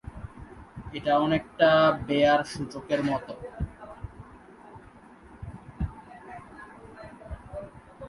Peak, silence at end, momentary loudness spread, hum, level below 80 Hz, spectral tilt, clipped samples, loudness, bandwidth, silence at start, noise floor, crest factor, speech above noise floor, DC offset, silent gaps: -8 dBFS; 0 s; 25 LU; none; -46 dBFS; -6 dB/octave; under 0.1%; -26 LUFS; 11.5 kHz; 0.05 s; -51 dBFS; 20 dB; 27 dB; under 0.1%; none